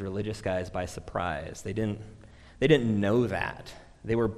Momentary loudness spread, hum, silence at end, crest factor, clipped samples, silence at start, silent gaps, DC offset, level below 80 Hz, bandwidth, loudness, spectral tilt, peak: 18 LU; none; 0 s; 22 dB; under 0.1%; 0 s; none; under 0.1%; -50 dBFS; 13 kHz; -29 LUFS; -6.5 dB/octave; -8 dBFS